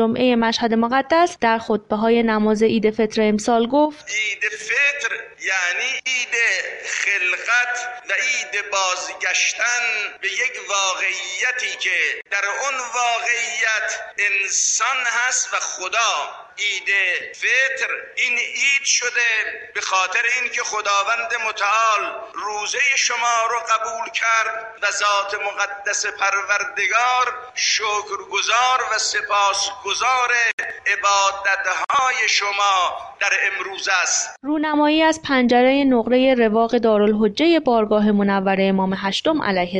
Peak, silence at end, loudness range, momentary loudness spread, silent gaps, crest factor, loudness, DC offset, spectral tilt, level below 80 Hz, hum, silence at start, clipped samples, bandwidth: -6 dBFS; 0 s; 3 LU; 6 LU; 30.53-30.58 s; 14 dB; -19 LUFS; under 0.1%; -2 dB/octave; -56 dBFS; none; 0 s; under 0.1%; 10.5 kHz